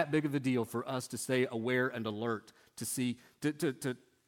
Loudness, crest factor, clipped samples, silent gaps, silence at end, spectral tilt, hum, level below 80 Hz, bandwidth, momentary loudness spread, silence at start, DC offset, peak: -35 LUFS; 20 dB; under 0.1%; none; 0.3 s; -5 dB/octave; none; -78 dBFS; 17.5 kHz; 8 LU; 0 s; under 0.1%; -16 dBFS